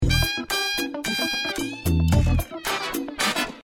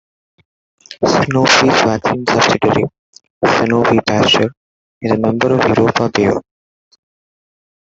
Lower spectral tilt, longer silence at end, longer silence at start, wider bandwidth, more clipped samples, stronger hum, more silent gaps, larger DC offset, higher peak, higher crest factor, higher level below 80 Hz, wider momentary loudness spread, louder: about the same, -4 dB/octave vs -4.5 dB/octave; second, 0 s vs 1.5 s; second, 0 s vs 0.9 s; first, 18 kHz vs 8 kHz; neither; neither; second, none vs 2.99-3.13 s, 3.30-3.41 s, 4.57-5.01 s; neither; second, -6 dBFS vs 0 dBFS; about the same, 16 dB vs 16 dB; first, -32 dBFS vs -50 dBFS; about the same, 6 LU vs 8 LU; second, -24 LUFS vs -13 LUFS